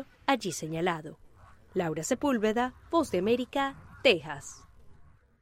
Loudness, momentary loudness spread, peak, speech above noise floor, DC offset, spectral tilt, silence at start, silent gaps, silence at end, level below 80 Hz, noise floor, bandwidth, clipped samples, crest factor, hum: -30 LUFS; 12 LU; -8 dBFS; 27 dB; under 0.1%; -4 dB/octave; 0 s; none; 0.4 s; -58 dBFS; -56 dBFS; 16 kHz; under 0.1%; 22 dB; none